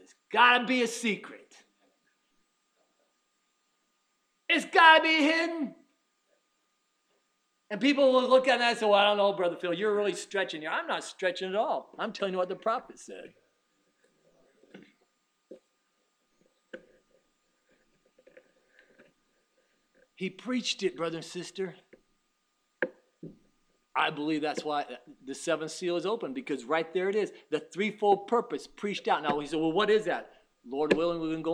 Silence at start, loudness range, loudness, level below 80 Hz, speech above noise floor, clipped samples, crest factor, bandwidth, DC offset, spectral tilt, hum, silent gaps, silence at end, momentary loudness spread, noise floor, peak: 0.3 s; 12 LU; -28 LUFS; -72 dBFS; 48 dB; under 0.1%; 26 dB; 13 kHz; under 0.1%; -3.5 dB/octave; none; none; 0 s; 16 LU; -76 dBFS; -6 dBFS